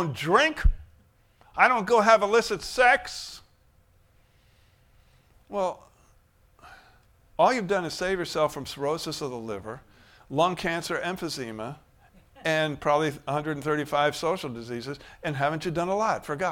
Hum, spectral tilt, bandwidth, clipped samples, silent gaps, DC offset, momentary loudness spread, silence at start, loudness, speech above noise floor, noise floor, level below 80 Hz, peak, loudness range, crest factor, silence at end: none; -4.5 dB/octave; 17 kHz; under 0.1%; none; under 0.1%; 16 LU; 0 s; -26 LUFS; 36 dB; -61 dBFS; -40 dBFS; -4 dBFS; 14 LU; 24 dB; 0 s